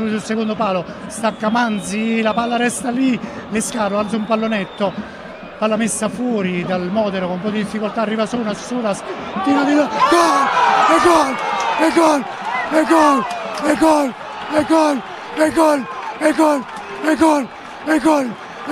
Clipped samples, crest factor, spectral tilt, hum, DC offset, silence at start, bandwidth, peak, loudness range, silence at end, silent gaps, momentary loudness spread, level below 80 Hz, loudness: under 0.1%; 16 dB; -4.5 dB/octave; none; under 0.1%; 0 s; 14.5 kHz; 0 dBFS; 6 LU; 0 s; none; 10 LU; -52 dBFS; -17 LUFS